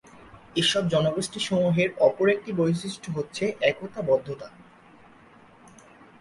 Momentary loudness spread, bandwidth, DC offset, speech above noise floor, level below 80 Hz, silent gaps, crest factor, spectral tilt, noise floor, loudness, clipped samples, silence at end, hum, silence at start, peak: 11 LU; 11.5 kHz; under 0.1%; 28 dB; -60 dBFS; none; 20 dB; -5 dB/octave; -53 dBFS; -25 LUFS; under 0.1%; 1.75 s; none; 0.2 s; -6 dBFS